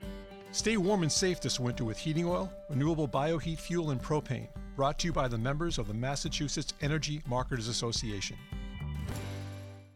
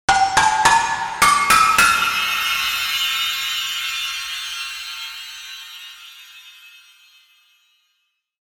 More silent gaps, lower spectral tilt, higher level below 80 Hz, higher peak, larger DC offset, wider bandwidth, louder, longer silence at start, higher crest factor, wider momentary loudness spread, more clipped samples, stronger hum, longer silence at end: neither; first, -4.5 dB/octave vs 0.5 dB/octave; first, -44 dBFS vs -50 dBFS; second, -16 dBFS vs -2 dBFS; neither; second, 15 kHz vs over 20 kHz; second, -33 LUFS vs -17 LUFS; about the same, 0 s vs 0.1 s; about the same, 16 dB vs 18 dB; second, 12 LU vs 20 LU; neither; neither; second, 0.05 s vs 1.75 s